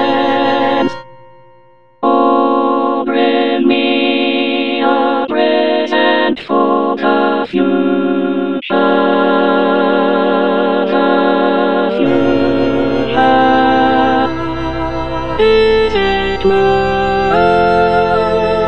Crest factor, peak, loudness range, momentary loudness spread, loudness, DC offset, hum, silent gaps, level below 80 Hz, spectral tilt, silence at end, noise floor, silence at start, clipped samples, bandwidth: 12 dB; 0 dBFS; 2 LU; 4 LU; -13 LUFS; under 0.1%; none; none; -36 dBFS; -7 dB/octave; 0 s; -47 dBFS; 0 s; under 0.1%; 7.4 kHz